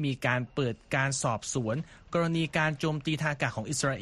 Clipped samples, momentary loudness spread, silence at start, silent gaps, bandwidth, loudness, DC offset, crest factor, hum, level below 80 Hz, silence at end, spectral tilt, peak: under 0.1%; 5 LU; 0 s; none; 12.5 kHz; -30 LUFS; under 0.1%; 18 dB; none; -58 dBFS; 0 s; -4.5 dB/octave; -12 dBFS